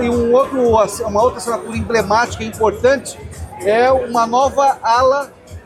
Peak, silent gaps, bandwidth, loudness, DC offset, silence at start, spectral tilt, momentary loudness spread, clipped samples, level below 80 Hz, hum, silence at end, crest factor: -2 dBFS; none; 15 kHz; -15 LUFS; under 0.1%; 0 s; -4.5 dB/octave; 9 LU; under 0.1%; -38 dBFS; none; 0.05 s; 14 dB